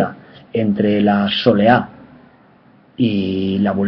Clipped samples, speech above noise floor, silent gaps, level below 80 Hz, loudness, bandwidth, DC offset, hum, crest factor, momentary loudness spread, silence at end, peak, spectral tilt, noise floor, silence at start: under 0.1%; 34 dB; none; -52 dBFS; -16 LUFS; 5.6 kHz; under 0.1%; none; 18 dB; 9 LU; 0 s; 0 dBFS; -8.5 dB/octave; -49 dBFS; 0 s